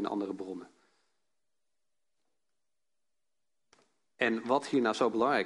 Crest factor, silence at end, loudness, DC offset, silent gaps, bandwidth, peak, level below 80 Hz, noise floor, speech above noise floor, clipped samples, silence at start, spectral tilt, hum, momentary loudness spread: 24 dB; 0 s; -31 LUFS; under 0.1%; none; 11.5 kHz; -12 dBFS; -80 dBFS; -90 dBFS; 59 dB; under 0.1%; 0 s; -5 dB/octave; none; 13 LU